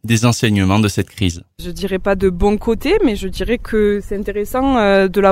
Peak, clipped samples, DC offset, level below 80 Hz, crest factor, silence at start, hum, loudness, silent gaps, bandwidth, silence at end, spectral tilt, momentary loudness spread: 0 dBFS; under 0.1%; under 0.1%; -30 dBFS; 14 dB; 0.05 s; none; -16 LUFS; none; 16 kHz; 0 s; -5.5 dB/octave; 9 LU